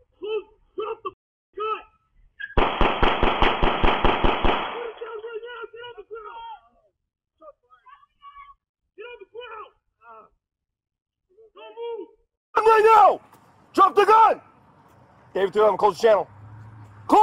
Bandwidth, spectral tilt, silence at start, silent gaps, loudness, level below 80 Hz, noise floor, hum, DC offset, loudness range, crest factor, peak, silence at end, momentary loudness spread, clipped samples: 13.5 kHz; -5.5 dB/octave; 0.2 s; 1.13-1.53 s, 8.69-8.74 s, 11.02-11.06 s, 12.37-12.53 s; -20 LUFS; -34 dBFS; -63 dBFS; none; under 0.1%; 22 LU; 18 dB; -6 dBFS; 0 s; 24 LU; under 0.1%